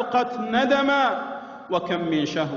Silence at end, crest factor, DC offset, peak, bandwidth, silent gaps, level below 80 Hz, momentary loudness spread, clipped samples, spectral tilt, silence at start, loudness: 0 s; 14 dB; under 0.1%; -10 dBFS; 7.4 kHz; none; -62 dBFS; 10 LU; under 0.1%; -5.5 dB/octave; 0 s; -23 LUFS